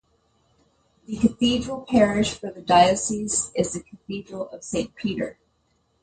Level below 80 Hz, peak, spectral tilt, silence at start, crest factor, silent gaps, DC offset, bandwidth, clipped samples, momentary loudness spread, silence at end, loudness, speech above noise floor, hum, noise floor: -50 dBFS; -4 dBFS; -4 dB/octave; 1.1 s; 20 dB; none; under 0.1%; 9.6 kHz; under 0.1%; 16 LU; 0.7 s; -23 LUFS; 45 dB; none; -68 dBFS